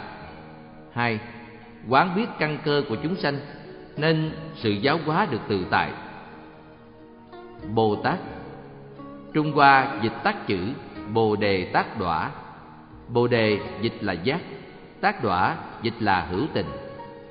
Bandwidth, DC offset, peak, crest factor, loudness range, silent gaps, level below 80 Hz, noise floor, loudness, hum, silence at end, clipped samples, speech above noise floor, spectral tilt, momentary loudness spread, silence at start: 5.4 kHz; under 0.1%; -2 dBFS; 22 dB; 5 LU; none; -54 dBFS; -47 dBFS; -24 LUFS; none; 0 s; under 0.1%; 23 dB; -4 dB/octave; 21 LU; 0 s